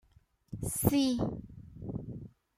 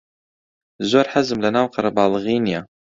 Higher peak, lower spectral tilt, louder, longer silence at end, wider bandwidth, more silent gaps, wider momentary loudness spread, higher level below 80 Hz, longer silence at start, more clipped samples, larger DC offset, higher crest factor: second, -12 dBFS vs -2 dBFS; about the same, -5.5 dB/octave vs -5.5 dB/octave; second, -33 LUFS vs -19 LUFS; about the same, 0.3 s vs 0.35 s; first, 16 kHz vs 7.8 kHz; neither; first, 20 LU vs 7 LU; about the same, -52 dBFS vs -56 dBFS; second, 0.5 s vs 0.8 s; neither; neither; about the same, 24 dB vs 20 dB